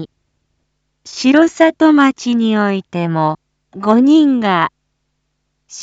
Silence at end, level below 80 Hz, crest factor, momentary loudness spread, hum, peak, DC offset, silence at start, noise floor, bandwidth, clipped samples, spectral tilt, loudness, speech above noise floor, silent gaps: 0 s; -62 dBFS; 14 dB; 12 LU; none; 0 dBFS; under 0.1%; 0 s; -69 dBFS; 8 kHz; under 0.1%; -5.5 dB/octave; -13 LUFS; 57 dB; none